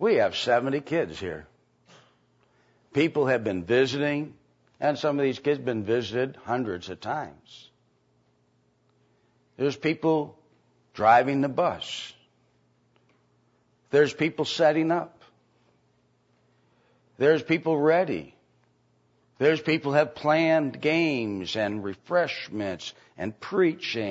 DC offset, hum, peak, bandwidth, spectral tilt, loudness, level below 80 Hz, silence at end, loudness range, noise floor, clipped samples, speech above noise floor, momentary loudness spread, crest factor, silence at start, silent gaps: under 0.1%; none; -6 dBFS; 8 kHz; -6 dB/octave; -26 LUFS; -68 dBFS; 0 s; 7 LU; -67 dBFS; under 0.1%; 42 dB; 13 LU; 20 dB; 0 s; none